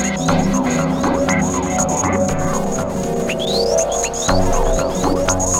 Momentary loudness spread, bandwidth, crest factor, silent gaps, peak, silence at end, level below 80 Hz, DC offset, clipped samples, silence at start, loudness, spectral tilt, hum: 4 LU; 16.5 kHz; 14 dB; none; -4 dBFS; 0 s; -26 dBFS; under 0.1%; under 0.1%; 0 s; -18 LUFS; -4 dB/octave; none